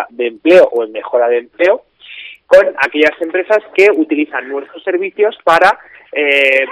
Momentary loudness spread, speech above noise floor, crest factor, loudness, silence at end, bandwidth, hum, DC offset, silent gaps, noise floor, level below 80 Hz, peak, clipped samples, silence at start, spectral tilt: 12 LU; 21 dB; 12 dB; -12 LUFS; 0 s; 12.5 kHz; none; under 0.1%; none; -33 dBFS; -56 dBFS; 0 dBFS; 0.6%; 0 s; -4 dB/octave